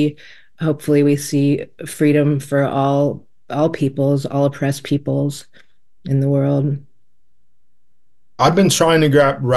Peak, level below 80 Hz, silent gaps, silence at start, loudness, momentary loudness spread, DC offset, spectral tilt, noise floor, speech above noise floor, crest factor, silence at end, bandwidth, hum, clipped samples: -2 dBFS; -52 dBFS; none; 0 s; -17 LUFS; 10 LU; 0.6%; -6 dB/octave; -73 dBFS; 57 dB; 16 dB; 0 s; 12.5 kHz; none; under 0.1%